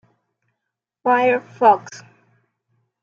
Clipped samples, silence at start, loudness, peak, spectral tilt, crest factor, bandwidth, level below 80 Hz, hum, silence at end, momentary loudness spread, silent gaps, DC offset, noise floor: under 0.1%; 1.05 s; -18 LUFS; -2 dBFS; -5 dB/octave; 20 dB; 7.4 kHz; -78 dBFS; none; 1 s; 10 LU; none; under 0.1%; -81 dBFS